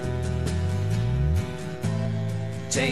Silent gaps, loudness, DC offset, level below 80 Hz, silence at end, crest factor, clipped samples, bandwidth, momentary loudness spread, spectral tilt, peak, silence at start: none; -27 LUFS; 0.9%; -36 dBFS; 0 s; 14 dB; under 0.1%; 13 kHz; 5 LU; -5.5 dB/octave; -10 dBFS; 0 s